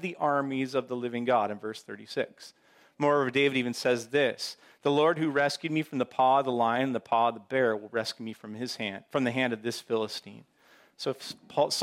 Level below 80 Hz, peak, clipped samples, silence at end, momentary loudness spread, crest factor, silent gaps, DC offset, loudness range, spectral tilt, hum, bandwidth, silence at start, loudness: -78 dBFS; -12 dBFS; under 0.1%; 0 s; 12 LU; 16 dB; none; under 0.1%; 6 LU; -4.5 dB/octave; none; 16 kHz; 0 s; -29 LUFS